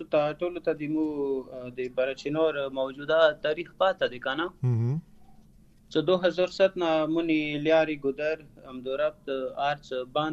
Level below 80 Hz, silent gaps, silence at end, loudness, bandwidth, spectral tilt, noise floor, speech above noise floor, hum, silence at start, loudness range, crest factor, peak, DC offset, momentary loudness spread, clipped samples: -60 dBFS; none; 0 s; -28 LUFS; 8 kHz; -7 dB/octave; -56 dBFS; 29 dB; none; 0 s; 2 LU; 18 dB; -8 dBFS; under 0.1%; 9 LU; under 0.1%